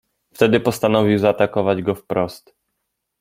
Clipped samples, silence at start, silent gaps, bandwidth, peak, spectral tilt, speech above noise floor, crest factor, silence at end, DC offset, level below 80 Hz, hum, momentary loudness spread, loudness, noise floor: under 0.1%; 0.4 s; none; 16.5 kHz; -2 dBFS; -6.5 dB/octave; 58 dB; 18 dB; 0.85 s; under 0.1%; -56 dBFS; none; 7 LU; -18 LUFS; -76 dBFS